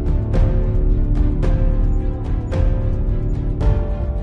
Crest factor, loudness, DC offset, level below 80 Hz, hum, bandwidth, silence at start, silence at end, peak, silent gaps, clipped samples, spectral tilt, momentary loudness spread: 12 dB; -21 LUFS; under 0.1%; -18 dBFS; none; 4.1 kHz; 0 s; 0 s; -6 dBFS; none; under 0.1%; -9.5 dB/octave; 4 LU